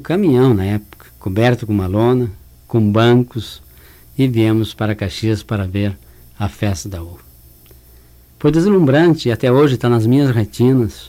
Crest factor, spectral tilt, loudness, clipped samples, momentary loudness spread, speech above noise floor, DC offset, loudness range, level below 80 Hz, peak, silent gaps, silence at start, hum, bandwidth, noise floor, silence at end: 14 dB; -7.5 dB/octave; -15 LUFS; under 0.1%; 13 LU; 30 dB; under 0.1%; 8 LU; -42 dBFS; -2 dBFS; none; 0 s; none; 16 kHz; -45 dBFS; 0 s